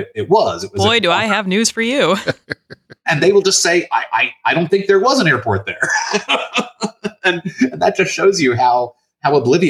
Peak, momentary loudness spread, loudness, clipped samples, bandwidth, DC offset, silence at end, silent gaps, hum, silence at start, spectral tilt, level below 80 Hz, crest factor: -2 dBFS; 9 LU; -15 LUFS; under 0.1%; 14.5 kHz; under 0.1%; 0 s; none; none; 0 s; -3.5 dB/octave; -60 dBFS; 14 dB